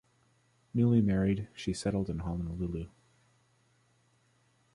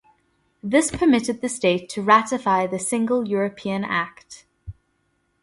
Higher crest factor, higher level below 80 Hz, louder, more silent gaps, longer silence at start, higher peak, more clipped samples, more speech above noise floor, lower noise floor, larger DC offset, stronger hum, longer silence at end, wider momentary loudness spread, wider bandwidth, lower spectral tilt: about the same, 18 dB vs 20 dB; about the same, -50 dBFS vs -52 dBFS; second, -32 LUFS vs -21 LUFS; neither; about the same, 0.75 s vs 0.65 s; second, -16 dBFS vs -2 dBFS; neither; second, 39 dB vs 48 dB; about the same, -70 dBFS vs -69 dBFS; neither; neither; first, 1.85 s vs 0.7 s; about the same, 11 LU vs 9 LU; about the same, 11.5 kHz vs 11.5 kHz; first, -7.5 dB/octave vs -4.5 dB/octave